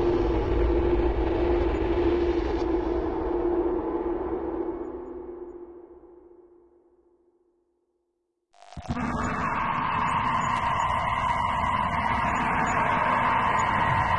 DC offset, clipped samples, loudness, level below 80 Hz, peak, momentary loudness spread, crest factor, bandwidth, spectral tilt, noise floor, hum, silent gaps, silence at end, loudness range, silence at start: under 0.1%; under 0.1%; -26 LUFS; -36 dBFS; -12 dBFS; 12 LU; 14 dB; 10.5 kHz; -6.5 dB/octave; -77 dBFS; none; none; 0 s; 14 LU; 0 s